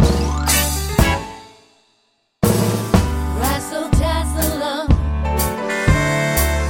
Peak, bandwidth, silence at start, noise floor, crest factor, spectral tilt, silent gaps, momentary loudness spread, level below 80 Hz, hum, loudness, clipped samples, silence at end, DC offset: 0 dBFS; 17 kHz; 0 s; -63 dBFS; 16 dB; -4.5 dB/octave; none; 5 LU; -22 dBFS; none; -18 LUFS; under 0.1%; 0 s; under 0.1%